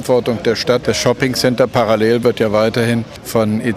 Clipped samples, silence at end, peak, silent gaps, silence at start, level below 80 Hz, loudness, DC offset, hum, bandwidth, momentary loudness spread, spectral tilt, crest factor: under 0.1%; 0 s; -2 dBFS; none; 0 s; -46 dBFS; -15 LUFS; under 0.1%; none; 15.5 kHz; 4 LU; -5 dB/octave; 14 dB